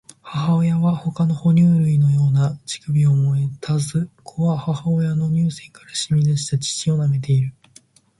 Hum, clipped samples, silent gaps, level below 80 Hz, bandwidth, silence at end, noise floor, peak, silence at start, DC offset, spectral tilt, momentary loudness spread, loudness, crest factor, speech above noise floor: none; under 0.1%; none; -54 dBFS; 11.5 kHz; 0.7 s; -52 dBFS; -8 dBFS; 0.25 s; under 0.1%; -6.5 dB/octave; 9 LU; -19 LUFS; 12 dB; 34 dB